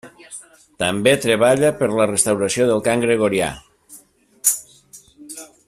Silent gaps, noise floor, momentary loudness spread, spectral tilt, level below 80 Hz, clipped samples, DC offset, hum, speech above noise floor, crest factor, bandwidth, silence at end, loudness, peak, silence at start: none; -49 dBFS; 21 LU; -3.5 dB/octave; -54 dBFS; under 0.1%; under 0.1%; none; 31 dB; 20 dB; 16 kHz; 0.25 s; -18 LUFS; 0 dBFS; 0.05 s